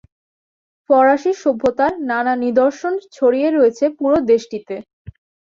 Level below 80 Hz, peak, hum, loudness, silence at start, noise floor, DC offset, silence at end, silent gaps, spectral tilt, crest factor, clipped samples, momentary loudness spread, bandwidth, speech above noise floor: -52 dBFS; -2 dBFS; none; -16 LUFS; 0.9 s; under -90 dBFS; under 0.1%; 0.4 s; 4.93-5.05 s; -5.5 dB/octave; 14 dB; under 0.1%; 10 LU; 7.6 kHz; over 74 dB